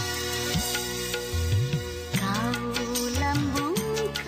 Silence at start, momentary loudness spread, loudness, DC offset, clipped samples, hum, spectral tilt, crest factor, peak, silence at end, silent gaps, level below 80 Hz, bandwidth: 0 s; 3 LU; -27 LUFS; under 0.1%; under 0.1%; none; -4 dB/octave; 12 dB; -14 dBFS; 0 s; none; -40 dBFS; 15.5 kHz